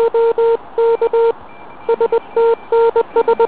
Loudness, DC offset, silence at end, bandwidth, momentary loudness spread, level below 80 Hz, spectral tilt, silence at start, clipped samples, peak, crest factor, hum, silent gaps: -15 LUFS; 1%; 0 s; 4 kHz; 4 LU; -54 dBFS; -8.5 dB/octave; 0 s; under 0.1%; -4 dBFS; 10 dB; none; none